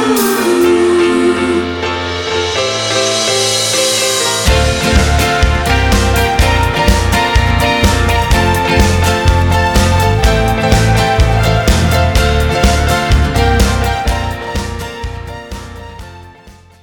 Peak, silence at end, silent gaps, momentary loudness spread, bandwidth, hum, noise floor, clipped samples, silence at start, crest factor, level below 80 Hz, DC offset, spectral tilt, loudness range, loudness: 0 dBFS; 0.3 s; none; 9 LU; 19 kHz; none; -39 dBFS; under 0.1%; 0 s; 12 dB; -18 dBFS; under 0.1%; -4.5 dB/octave; 3 LU; -12 LUFS